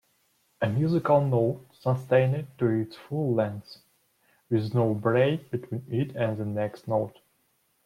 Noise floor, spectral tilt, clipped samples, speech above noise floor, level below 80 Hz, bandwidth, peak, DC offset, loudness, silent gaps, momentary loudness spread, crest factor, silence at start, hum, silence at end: -70 dBFS; -9 dB/octave; under 0.1%; 44 dB; -66 dBFS; 14 kHz; -10 dBFS; under 0.1%; -27 LUFS; none; 9 LU; 18 dB; 0.6 s; none; 0.75 s